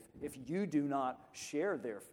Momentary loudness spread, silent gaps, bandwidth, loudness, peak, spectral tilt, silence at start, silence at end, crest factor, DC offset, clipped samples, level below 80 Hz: 12 LU; none; 17 kHz; -39 LUFS; -24 dBFS; -5.5 dB/octave; 0 s; 0 s; 16 dB; under 0.1%; under 0.1%; -72 dBFS